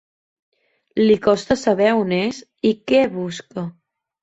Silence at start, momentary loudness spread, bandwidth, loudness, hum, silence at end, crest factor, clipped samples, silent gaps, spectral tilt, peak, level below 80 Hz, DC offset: 0.95 s; 13 LU; 8.2 kHz; -19 LUFS; none; 0.5 s; 16 dB; under 0.1%; none; -5.5 dB/octave; -4 dBFS; -54 dBFS; under 0.1%